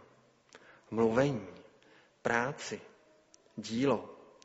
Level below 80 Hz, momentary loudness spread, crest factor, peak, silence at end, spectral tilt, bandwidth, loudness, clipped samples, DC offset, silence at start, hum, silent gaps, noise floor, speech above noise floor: -68 dBFS; 18 LU; 22 dB; -14 dBFS; 0.25 s; -5 dB/octave; 8 kHz; -33 LUFS; under 0.1%; under 0.1%; 0.55 s; none; none; -64 dBFS; 32 dB